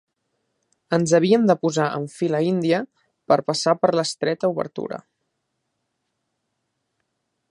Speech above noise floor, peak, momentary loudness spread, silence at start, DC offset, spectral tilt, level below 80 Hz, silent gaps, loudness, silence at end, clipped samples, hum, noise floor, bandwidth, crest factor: 56 dB; -2 dBFS; 12 LU; 0.9 s; under 0.1%; -5.5 dB/octave; -70 dBFS; none; -21 LUFS; 2.5 s; under 0.1%; none; -76 dBFS; 11.5 kHz; 20 dB